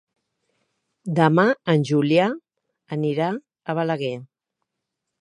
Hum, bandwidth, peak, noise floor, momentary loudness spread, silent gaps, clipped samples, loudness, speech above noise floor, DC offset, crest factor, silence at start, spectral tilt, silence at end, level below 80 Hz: none; 10.5 kHz; -2 dBFS; -82 dBFS; 14 LU; none; under 0.1%; -22 LUFS; 61 dB; under 0.1%; 22 dB; 1.05 s; -7.5 dB/octave; 0.95 s; -72 dBFS